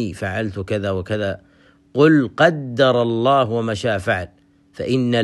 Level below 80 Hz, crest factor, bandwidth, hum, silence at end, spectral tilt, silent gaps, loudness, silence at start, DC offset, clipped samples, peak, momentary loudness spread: -52 dBFS; 18 dB; 12 kHz; none; 0 s; -6.5 dB/octave; none; -19 LUFS; 0 s; under 0.1%; under 0.1%; 0 dBFS; 11 LU